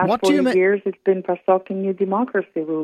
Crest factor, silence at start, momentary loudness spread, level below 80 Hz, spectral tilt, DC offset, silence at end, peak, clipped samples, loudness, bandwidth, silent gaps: 14 dB; 0 s; 7 LU; -64 dBFS; -6 dB/octave; under 0.1%; 0 s; -4 dBFS; under 0.1%; -20 LUFS; 13 kHz; none